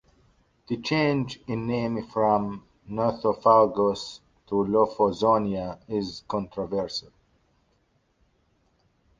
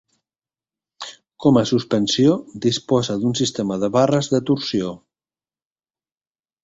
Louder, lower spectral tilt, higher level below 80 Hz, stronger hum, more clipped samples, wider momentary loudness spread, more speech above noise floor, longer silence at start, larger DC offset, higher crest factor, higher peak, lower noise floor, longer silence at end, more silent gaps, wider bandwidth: second, -25 LUFS vs -19 LUFS; about the same, -6.5 dB/octave vs -5.5 dB/octave; about the same, -56 dBFS vs -56 dBFS; neither; neither; about the same, 14 LU vs 13 LU; second, 43 dB vs over 71 dB; second, 0.7 s vs 1 s; neither; about the same, 22 dB vs 18 dB; about the same, -4 dBFS vs -2 dBFS; second, -68 dBFS vs under -90 dBFS; first, 2.2 s vs 1.7 s; neither; about the same, 7.6 kHz vs 8 kHz